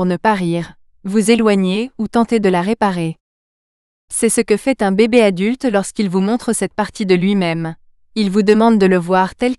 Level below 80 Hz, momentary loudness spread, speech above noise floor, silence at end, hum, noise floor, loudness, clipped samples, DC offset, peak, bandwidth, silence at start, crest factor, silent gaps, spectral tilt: -50 dBFS; 10 LU; over 75 dB; 0.05 s; none; under -90 dBFS; -15 LUFS; under 0.1%; under 0.1%; 0 dBFS; 13.5 kHz; 0 s; 16 dB; 3.20-4.08 s; -5.5 dB/octave